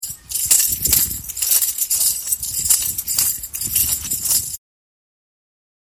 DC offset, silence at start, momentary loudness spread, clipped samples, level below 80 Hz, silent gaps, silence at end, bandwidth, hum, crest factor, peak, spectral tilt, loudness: under 0.1%; 0 s; 8 LU; under 0.1%; -44 dBFS; none; 1.4 s; 17.5 kHz; none; 20 dB; 0 dBFS; 0.5 dB/octave; -16 LUFS